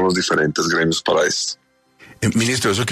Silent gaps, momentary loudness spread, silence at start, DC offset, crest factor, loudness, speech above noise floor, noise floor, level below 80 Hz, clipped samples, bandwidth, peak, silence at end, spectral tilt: none; 6 LU; 0 s; under 0.1%; 14 dB; -18 LUFS; 31 dB; -50 dBFS; -52 dBFS; under 0.1%; 13.5 kHz; -6 dBFS; 0 s; -3.5 dB/octave